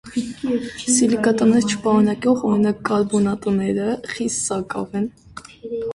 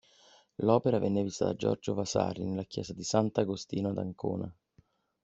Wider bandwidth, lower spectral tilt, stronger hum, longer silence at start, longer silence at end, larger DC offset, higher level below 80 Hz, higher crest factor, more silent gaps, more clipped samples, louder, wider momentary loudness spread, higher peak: first, 11.5 kHz vs 8.2 kHz; about the same, -5 dB/octave vs -6 dB/octave; neither; second, 0.05 s vs 0.6 s; second, 0 s vs 0.7 s; neither; first, -52 dBFS vs -64 dBFS; second, 16 dB vs 22 dB; neither; neither; first, -20 LUFS vs -32 LUFS; about the same, 11 LU vs 10 LU; first, -4 dBFS vs -10 dBFS